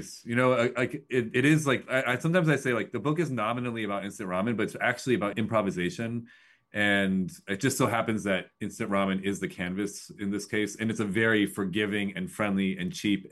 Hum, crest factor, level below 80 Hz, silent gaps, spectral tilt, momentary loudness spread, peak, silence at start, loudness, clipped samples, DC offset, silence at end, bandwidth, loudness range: none; 18 dB; -66 dBFS; none; -5.5 dB/octave; 9 LU; -10 dBFS; 0 s; -28 LUFS; under 0.1%; under 0.1%; 0.05 s; 12.5 kHz; 3 LU